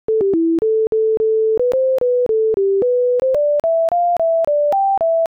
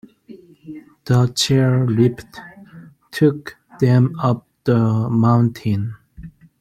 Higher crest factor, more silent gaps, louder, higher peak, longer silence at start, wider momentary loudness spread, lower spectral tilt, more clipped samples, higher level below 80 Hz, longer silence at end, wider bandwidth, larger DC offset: second, 4 dB vs 16 dB; first, 0.87-0.92 s vs none; about the same, -16 LUFS vs -17 LUFS; second, -12 dBFS vs -2 dBFS; second, 0.1 s vs 0.3 s; second, 1 LU vs 22 LU; first, -8 dB/octave vs -6.5 dB/octave; neither; about the same, -54 dBFS vs -52 dBFS; second, 0.1 s vs 0.3 s; second, 6.4 kHz vs 13.5 kHz; neither